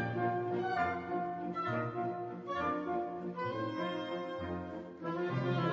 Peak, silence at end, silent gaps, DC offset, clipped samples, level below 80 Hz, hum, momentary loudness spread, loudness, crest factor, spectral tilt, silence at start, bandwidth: -20 dBFS; 0 s; none; under 0.1%; under 0.1%; -66 dBFS; none; 6 LU; -37 LUFS; 16 dB; -5.5 dB/octave; 0 s; 7.4 kHz